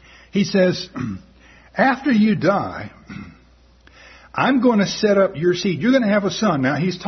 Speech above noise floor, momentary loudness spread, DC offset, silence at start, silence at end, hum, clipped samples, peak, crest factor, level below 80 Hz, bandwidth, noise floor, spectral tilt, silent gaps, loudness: 33 dB; 16 LU; under 0.1%; 0.35 s; 0 s; none; under 0.1%; -4 dBFS; 16 dB; -52 dBFS; 6.4 kHz; -51 dBFS; -6 dB/octave; none; -18 LUFS